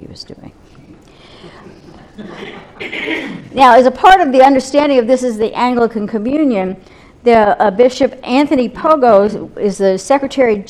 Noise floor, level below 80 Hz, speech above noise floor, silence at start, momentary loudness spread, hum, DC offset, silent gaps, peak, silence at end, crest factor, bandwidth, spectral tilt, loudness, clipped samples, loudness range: -40 dBFS; -44 dBFS; 29 dB; 0 s; 21 LU; none; under 0.1%; none; 0 dBFS; 0.05 s; 12 dB; 12.5 kHz; -5 dB/octave; -12 LUFS; 0.2%; 6 LU